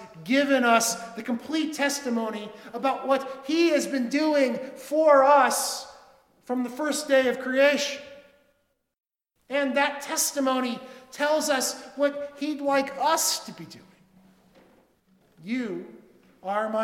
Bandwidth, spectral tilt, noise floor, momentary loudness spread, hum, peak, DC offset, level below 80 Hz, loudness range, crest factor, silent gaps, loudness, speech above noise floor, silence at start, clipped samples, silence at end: 18 kHz; -2 dB/octave; -72 dBFS; 14 LU; none; -6 dBFS; under 0.1%; -74 dBFS; 6 LU; 20 dB; none; -25 LUFS; 47 dB; 0 s; under 0.1%; 0 s